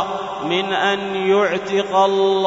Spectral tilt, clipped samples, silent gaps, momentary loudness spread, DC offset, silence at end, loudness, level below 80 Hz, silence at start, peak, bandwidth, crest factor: -4.5 dB/octave; under 0.1%; none; 6 LU; under 0.1%; 0 s; -18 LUFS; -58 dBFS; 0 s; -4 dBFS; 7.8 kHz; 14 dB